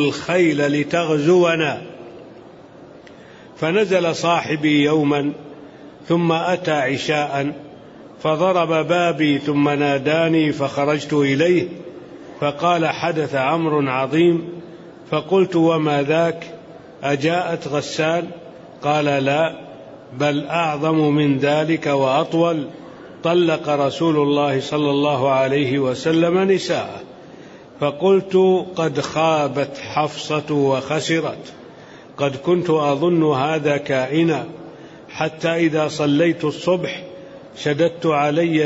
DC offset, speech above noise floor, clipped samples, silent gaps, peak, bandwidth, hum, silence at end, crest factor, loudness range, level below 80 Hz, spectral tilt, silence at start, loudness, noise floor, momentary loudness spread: under 0.1%; 24 dB; under 0.1%; none; -4 dBFS; 8 kHz; none; 0 s; 14 dB; 3 LU; -60 dBFS; -6 dB/octave; 0 s; -19 LUFS; -42 dBFS; 16 LU